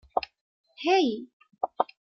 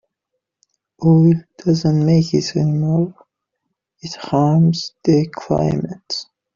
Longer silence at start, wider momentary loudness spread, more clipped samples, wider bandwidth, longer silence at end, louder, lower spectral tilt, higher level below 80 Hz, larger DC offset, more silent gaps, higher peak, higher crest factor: second, 0.15 s vs 1 s; about the same, 14 LU vs 13 LU; neither; about the same, 7 kHz vs 7.4 kHz; about the same, 0.3 s vs 0.35 s; second, -28 LUFS vs -17 LUFS; second, -4 dB/octave vs -8 dB/octave; second, -68 dBFS vs -50 dBFS; neither; first, 0.41-0.64 s, 1.33-1.40 s vs none; second, -8 dBFS vs -2 dBFS; first, 20 dB vs 14 dB